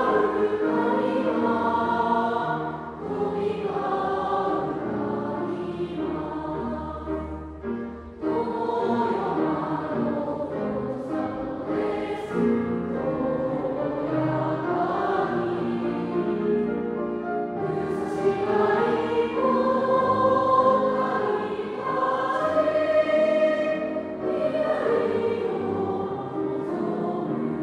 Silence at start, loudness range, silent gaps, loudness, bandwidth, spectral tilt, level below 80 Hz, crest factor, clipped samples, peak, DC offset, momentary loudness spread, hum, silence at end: 0 s; 5 LU; none; -25 LUFS; 10.5 kHz; -8 dB/octave; -52 dBFS; 16 dB; under 0.1%; -8 dBFS; under 0.1%; 8 LU; none; 0 s